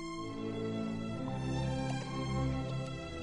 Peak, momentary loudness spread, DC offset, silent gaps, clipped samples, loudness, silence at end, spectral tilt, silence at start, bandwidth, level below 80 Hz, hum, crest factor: -24 dBFS; 5 LU; under 0.1%; none; under 0.1%; -37 LUFS; 0 s; -6.5 dB/octave; 0 s; 11 kHz; -48 dBFS; none; 14 dB